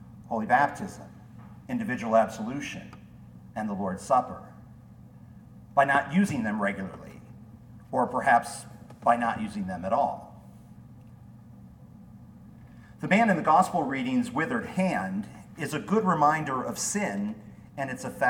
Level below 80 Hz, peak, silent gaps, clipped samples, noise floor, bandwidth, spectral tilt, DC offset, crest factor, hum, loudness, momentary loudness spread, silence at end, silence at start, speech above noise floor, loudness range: -60 dBFS; -8 dBFS; none; under 0.1%; -49 dBFS; 17.5 kHz; -5.5 dB/octave; under 0.1%; 20 dB; none; -27 LUFS; 21 LU; 0 s; 0 s; 23 dB; 7 LU